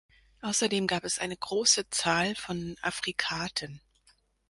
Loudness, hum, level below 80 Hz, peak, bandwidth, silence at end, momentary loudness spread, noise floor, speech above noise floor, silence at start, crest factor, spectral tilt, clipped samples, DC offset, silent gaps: -29 LUFS; none; -62 dBFS; -8 dBFS; 11.5 kHz; 0.7 s; 12 LU; -67 dBFS; 37 dB; 0.45 s; 22 dB; -2 dB/octave; under 0.1%; under 0.1%; none